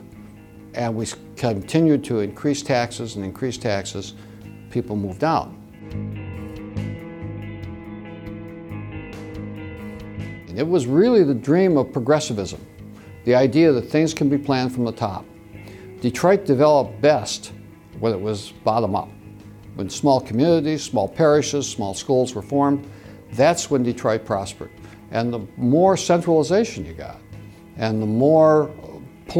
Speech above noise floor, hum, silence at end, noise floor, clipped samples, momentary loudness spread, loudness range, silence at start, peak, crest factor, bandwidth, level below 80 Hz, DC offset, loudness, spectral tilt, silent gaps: 23 dB; none; 0 s; -42 dBFS; under 0.1%; 20 LU; 9 LU; 0 s; -4 dBFS; 18 dB; 15.5 kHz; -50 dBFS; under 0.1%; -20 LUFS; -6 dB/octave; none